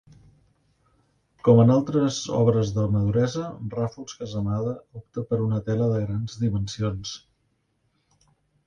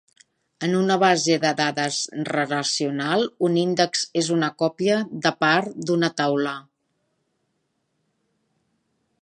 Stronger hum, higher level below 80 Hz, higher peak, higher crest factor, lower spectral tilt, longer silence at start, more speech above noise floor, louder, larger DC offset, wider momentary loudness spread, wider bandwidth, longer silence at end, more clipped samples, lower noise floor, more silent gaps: neither; first, -50 dBFS vs -74 dBFS; second, -6 dBFS vs -2 dBFS; about the same, 20 dB vs 22 dB; first, -7.5 dB/octave vs -4 dB/octave; first, 1.45 s vs 0.6 s; second, 48 dB vs 52 dB; about the same, -24 LUFS vs -22 LUFS; neither; first, 15 LU vs 6 LU; second, 7.4 kHz vs 10.5 kHz; second, 1.5 s vs 2.6 s; neither; about the same, -71 dBFS vs -73 dBFS; neither